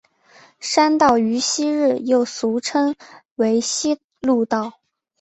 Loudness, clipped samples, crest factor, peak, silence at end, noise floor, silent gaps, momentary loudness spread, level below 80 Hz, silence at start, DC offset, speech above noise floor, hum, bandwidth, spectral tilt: -19 LUFS; under 0.1%; 18 dB; -2 dBFS; 0.5 s; -51 dBFS; 3.25-3.36 s, 4.04-4.10 s; 9 LU; -60 dBFS; 0.6 s; under 0.1%; 33 dB; none; 8.2 kHz; -3 dB/octave